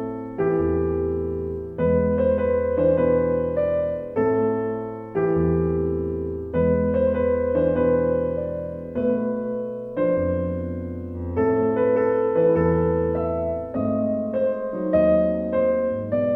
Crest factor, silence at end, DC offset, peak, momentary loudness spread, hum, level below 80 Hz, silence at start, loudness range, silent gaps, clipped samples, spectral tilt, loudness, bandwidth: 14 dB; 0 s; under 0.1%; -8 dBFS; 9 LU; none; -40 dBFS; 0 s; 2 LU; none; under 0.1%; -11.5 dB/octave; -23 LUFS; 3.8 kHz